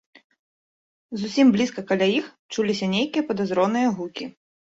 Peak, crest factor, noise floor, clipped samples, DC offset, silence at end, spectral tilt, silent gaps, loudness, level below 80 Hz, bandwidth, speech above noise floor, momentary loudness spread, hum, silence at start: -8 dBFS; 16 dB; under -90 dBFS; under 0.1%; under 0.1%; 0.4 s; -5.5 dB/octave; 2.39-2.49 s; -23 LUFS; -66 dBFS; 7.8 kHz; over 68 dB; 14 LU; none; 1.1 s